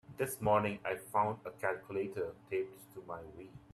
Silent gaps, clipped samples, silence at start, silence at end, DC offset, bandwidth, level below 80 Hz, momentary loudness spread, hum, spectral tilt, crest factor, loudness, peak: none; under 0.1%; 0.1 s; 0.15 s; under 0.1%; 14 kHz; -68 dBFS; 16 LU; none; -5.5 dB/octave; 20 dB; -37 LUFS; -18 dBFS